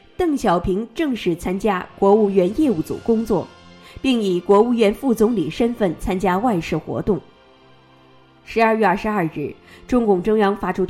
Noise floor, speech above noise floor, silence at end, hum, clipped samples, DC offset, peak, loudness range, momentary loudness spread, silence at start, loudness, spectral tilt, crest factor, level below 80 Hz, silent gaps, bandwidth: -50 dBFS; 32 dB; 0 s; none; under 0.1%; under 0.1%; -4 dBFS; 4 LU; 8 LU; 0.2 s; -19 LUFS; -6.5 dB/octave; 16 dB; -42 dBFS; none; 15.5 kHz